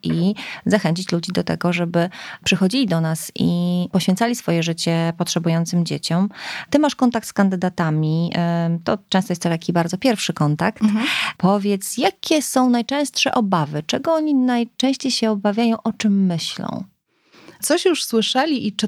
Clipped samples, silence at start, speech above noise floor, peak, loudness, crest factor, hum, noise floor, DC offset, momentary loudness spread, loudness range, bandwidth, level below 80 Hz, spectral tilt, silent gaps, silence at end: under 0.1%; 0.05 s; 34 dB; -2 dBFS; -20 LUFS; 18 dB; none; -53 dBFS; under 0.1%; 5 LU; 2 LU; 15.5 kHz; -60 dBFS; -5 dB/octave; none; 0 s